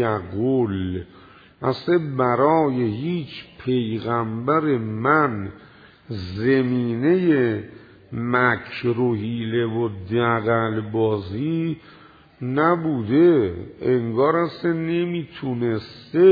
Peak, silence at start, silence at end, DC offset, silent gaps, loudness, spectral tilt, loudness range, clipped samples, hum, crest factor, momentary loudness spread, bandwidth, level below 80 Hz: -4 dBFS; 0 s; 0 s; under 0.1%; none; -22 LUFS; -10 dB/octave; 2 LU; under 0.1%; none; 18 dB; 11 LU; 5 kHz; -56 dBFS